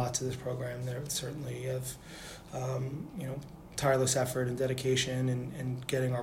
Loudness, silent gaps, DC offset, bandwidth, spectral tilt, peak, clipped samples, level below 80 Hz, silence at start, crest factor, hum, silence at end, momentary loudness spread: -34 LUFS; none; under 0.1%; 16 kHz; -4.5 dB/octave; -14 dBFS; under 0.1%; -58 dBFS; 0 s; 18 dB; none; 0 s; 12 LU